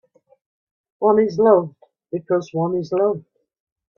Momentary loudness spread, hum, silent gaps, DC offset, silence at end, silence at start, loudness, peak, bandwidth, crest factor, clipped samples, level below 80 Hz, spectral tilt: 15 LU; none; none; under 0.1%; 0.8 s; 1 s; -19 LUFS; -2 dBFS; 6.8 kHz; 20 dB; under 0.1%; -66 dBFS; -8.5 dB/octave